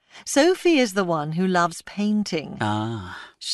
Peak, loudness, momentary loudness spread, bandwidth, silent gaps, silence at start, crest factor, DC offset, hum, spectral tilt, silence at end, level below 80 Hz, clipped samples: -6 dBFS; -22 LUFS; 11 LU; 12 kHz; none; 0.15 s; 16 dB; under 0.1%; none; -4.5 dB/octave; 0 s; -62 dBFS; under 0.1%